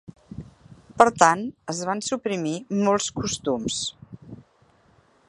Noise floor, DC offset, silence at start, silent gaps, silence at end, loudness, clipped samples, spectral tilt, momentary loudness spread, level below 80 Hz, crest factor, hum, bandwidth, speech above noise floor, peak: -60 dBFS; under 0.1%; 0.3 s; none; 0.85 s; -23 LUFS; under 0.1%; -3.5 dB/octave; 23 LU; -56 dBFS; 26 dB; none; 11.5 kHz; 37 dB; 0 dBFS